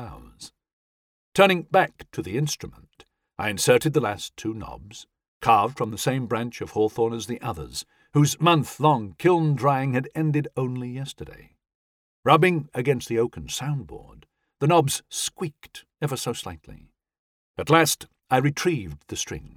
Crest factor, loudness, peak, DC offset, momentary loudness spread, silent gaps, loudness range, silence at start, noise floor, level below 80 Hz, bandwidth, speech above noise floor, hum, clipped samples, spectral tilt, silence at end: 22 dB; -24 LUFS; -2 dBFS; under 0.1%; 22 LU; 0.73-1.32 s, 5.28-5.41 s, 11.75-12.23 s, 17.19-17.54 s; 4 LU; 0 s; -58 dBFS; -54 dBFS; 17 kHz; 34 dB; none; under 0.1%; -5 dB/octave; 0.1 s